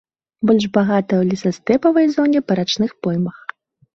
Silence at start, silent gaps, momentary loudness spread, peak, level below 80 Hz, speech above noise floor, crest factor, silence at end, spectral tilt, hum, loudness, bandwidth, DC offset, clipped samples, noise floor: 0.4 s; none; 7 LU; -2 dBFS; -58 dBFS; 20 dB; 16 dB; 0.65 s; -6.5 dB/octave; none; -17 LUFS; 7.6 kHz; under 0.1%; under 0.1%; -36 dBFS